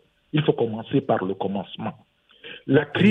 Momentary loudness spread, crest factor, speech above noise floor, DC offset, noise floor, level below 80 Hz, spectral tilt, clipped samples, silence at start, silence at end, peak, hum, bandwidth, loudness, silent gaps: 14 LU; 20 dB; 22 dB; under 0.1%; -44 dBFS; -60 dBFS; -8.5 dB/octave; under 0.1%; 0.35 s; 0 s; -4 dBFS; none; 4.1 kHz; -24 LUFS; none